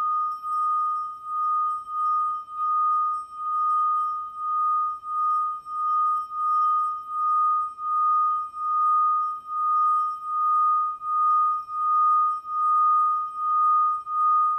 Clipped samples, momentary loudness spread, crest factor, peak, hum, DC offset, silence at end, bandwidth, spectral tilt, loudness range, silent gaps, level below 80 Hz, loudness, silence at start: under 0.1%; 7 LU; 8 dB; -16 dBFS; none; under 0.1%; 0 s; 8.8 kHz; -2.5 dB/octave; 3 LU; none; -72 dBFS; -23 LUFS; 0 s